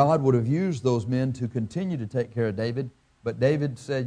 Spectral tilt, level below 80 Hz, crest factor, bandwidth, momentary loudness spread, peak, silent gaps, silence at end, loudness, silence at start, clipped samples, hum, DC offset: -8 dB/octave; -60 dBFS; 20 dB; 10 kHz; 9 LU; -6 dBFS; none; 0 s; -26 LUFS; 0 s; under 0.1%; none; under 0.1%